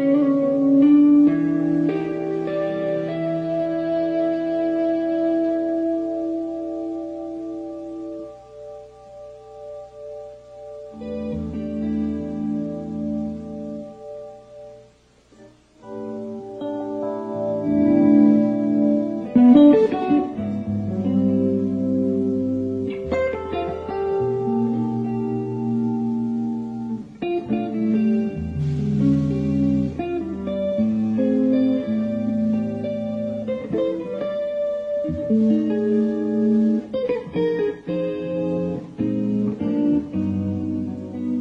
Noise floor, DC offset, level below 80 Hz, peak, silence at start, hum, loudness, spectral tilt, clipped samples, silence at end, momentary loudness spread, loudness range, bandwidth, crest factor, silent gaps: -54 dBFS; under 0.1%; -50 dBFS; -2 dBFS; 0 s; none; -22 LUFS; -9.5 dB/octave; under 0.1%; 0 s; 15 LU; 15 LU; 6 kHz; 18 dB; none